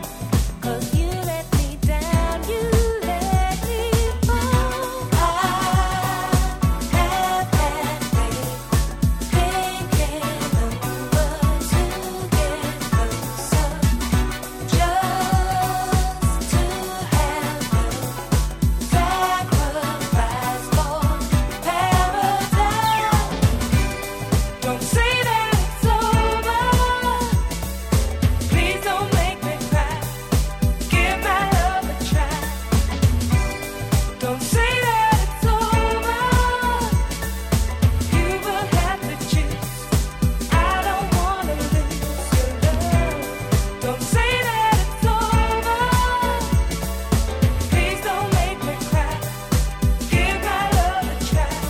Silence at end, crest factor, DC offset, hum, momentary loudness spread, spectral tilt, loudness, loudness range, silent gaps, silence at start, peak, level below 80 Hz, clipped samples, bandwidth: 0 s; 16 dB; under 0.1%; none; 6 LU; -5 dB/octave; -21 LUFS; 2 LU; none; 0 s; -4 dBFS; -24 dBFS; under 0.1%; 17.5 kHz